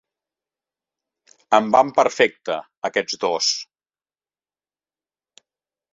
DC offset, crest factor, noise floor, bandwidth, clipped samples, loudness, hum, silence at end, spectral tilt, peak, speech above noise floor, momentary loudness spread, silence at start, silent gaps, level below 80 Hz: under 0.1%; 22 dB; under -90 dBFS; 7.8 kHz; under 0.1%; -20 LUFS; 50 Hz at -75 dBFS; 2.3 s; -2 dB/octave; -2 dBFS; over 70 dB; 12 LU; 1.5 s; 2.77-2.82 s; -68 dBFS